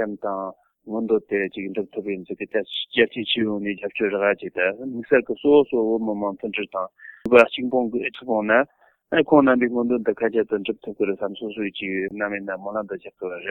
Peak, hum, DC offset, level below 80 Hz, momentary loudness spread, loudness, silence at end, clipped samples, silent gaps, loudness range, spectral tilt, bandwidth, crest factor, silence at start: 0 dBFS; none; under 0.1%; -64 dBFS; 13 LU; -22 LUFS; 0 s; under 0.1%; none; 5 LU; -7 dB/octave; 6.6 kHz; 22 dB; 0 s